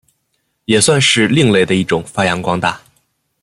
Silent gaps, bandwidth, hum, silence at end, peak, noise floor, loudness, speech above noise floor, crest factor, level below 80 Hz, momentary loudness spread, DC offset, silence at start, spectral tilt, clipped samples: none; 13.5 kHz; none; 0.65 s; 0 dBFS; -67 dBFS; -13 LUFS; 54 dB; 16 dB; -50 dBFS; 9 LU; under 0.1%; 0.7 s; -4 dB/octave; under 0.1%